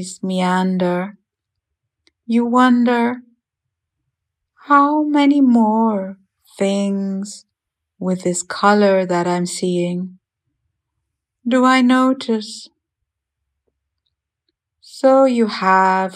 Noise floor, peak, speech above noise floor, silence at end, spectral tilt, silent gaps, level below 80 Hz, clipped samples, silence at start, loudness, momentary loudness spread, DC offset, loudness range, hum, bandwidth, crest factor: -80 dBFS; -2 dBFS; 64 dB; 0 s; -5.5 dB/octave; none; -74 dBFS; under 0.1%; 0 s; -16 LUFS; 14 LU; under 0.1%; 4 LU; none; 11.5 kHz; 18 dB